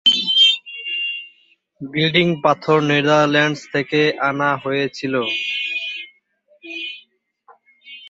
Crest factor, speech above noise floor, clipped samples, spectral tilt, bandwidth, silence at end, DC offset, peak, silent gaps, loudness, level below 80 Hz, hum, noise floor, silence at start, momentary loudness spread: 20 dB; 41 dB; under 0.1%; -4.5 dB/octave; 8 kHz; 0 s; under 0.1%; 0 dBFS; none; -17 LUFS; -64 dBFS; none; -58 dBFS; 0.05 s; 16 LU